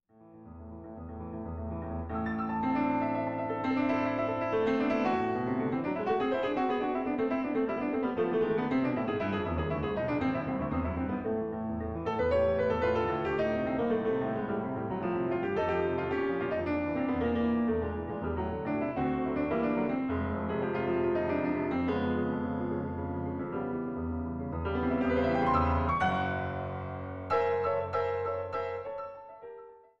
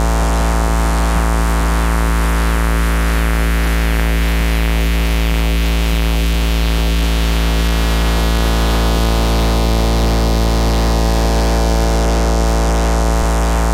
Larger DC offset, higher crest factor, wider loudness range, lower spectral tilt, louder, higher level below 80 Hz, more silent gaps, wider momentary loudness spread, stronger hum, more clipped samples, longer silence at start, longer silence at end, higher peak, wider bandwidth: neither; about the same, 16 dB vs 12 dB; about the same, 3 LU vs 1 LU; first, -9 dB/octave vs -5 dB/octave; second, -31 LUFS vs -16 LUFS; second, -50 dBFS vs -14 dBFS; neither; first, 8 LU vs 1 LU; neither; neither; first, 0.2 s vs 0 s; first, 0.2 s vs 0 s; second, -14 dBFS vs -2 dBFS; second, 6.8 kHz vs 16 kHz